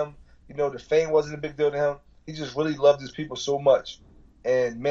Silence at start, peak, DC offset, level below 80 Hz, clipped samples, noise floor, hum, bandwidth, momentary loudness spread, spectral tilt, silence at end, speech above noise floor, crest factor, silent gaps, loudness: 0 s; -8 dBFS; under 0.1%; -54 dBFS; under 0.1%; -45 dBFS; none; 7.6 kHz; 14 LU; -5 dB/octave; 0 s; 21 dB; 18 dB; none; -25 LUFS